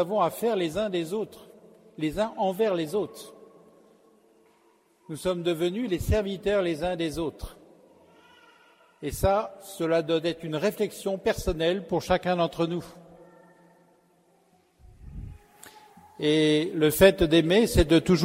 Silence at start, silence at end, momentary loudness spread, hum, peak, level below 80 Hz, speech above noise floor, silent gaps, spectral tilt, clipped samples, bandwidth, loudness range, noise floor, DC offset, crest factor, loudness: 0 s; 0 s; 17 LU; none; -4 dBFS; -42 dBFS; 39 dB; none; -5.5 dB/octave; under 0.1%; 16 kHz; 7 LU; -64 dBFS; under 0.1%; 22 dB; -26 LUFS